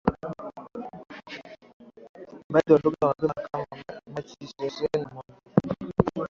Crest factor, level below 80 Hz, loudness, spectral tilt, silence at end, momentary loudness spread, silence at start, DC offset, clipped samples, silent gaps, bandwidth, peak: 24 dB; -52 dBFS; -27 LUFS; -8 dB/octave; 0 s; 22 LU; 0.05 s; under 0.1%; under 0.1%; 1.73-1.80 s, 2.09-2.14 s, 2.44-2.50 s; 7.2 kHz; -4 dBFS